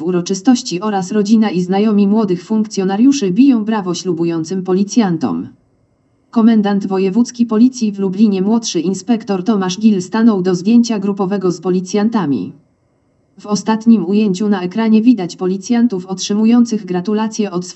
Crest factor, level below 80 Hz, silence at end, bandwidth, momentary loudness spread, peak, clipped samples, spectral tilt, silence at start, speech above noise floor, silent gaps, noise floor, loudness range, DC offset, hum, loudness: 14 dB; -68 dBFS; 0.05 s; 8.2 kHz; 7 LU; 0 dBFS; under 0.1%; -6 dB/octave; 0 s; 44 dB; none; -58 dBFS; 3 LU; under 0.1%; none; -14 LUFS